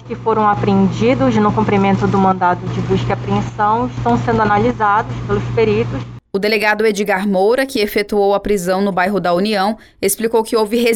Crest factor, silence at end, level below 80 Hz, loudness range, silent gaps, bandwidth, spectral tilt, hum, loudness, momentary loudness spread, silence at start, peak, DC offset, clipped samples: 12 dB; 0 s; -38 dBFS; 1 LU; none; 18 kHz; -6 dB/octave; none; -15 LUFS; 5 LU; 0 s; -2 dBFS; under 0.1%; under 0.1%